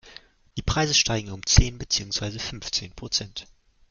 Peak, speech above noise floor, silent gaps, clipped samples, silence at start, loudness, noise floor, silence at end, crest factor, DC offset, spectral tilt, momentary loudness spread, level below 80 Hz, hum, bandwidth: -2 dBFS; 25 dB; none; under 0.1%; 0.05 s; -24 LUFS; -50 dBFS; 0.5 s; 24 dB; under 0.1%; -3 dB/octave; 13 LU; -32 dBFS; none; 10.5 kHz